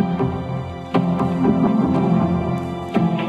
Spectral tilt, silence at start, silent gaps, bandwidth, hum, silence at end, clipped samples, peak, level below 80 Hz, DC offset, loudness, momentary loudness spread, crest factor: -9 dB/octave; 0 s; none; 7.4 kHz; none; 0 s; under 0.1%; -4 dBFS; -42 dBFS; under 0.1%; -20 LUFS; 8 LU; 14 dB